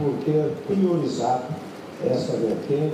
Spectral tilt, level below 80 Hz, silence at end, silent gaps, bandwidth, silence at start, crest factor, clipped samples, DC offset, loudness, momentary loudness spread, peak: -7.5 dB/octave; -66 dBFS; 0 s; none; 14.5 kHz; 0 s; 14 dB; under 0.1%; under 0.1%; -24 LUFS; 9 LU; -10 dBFS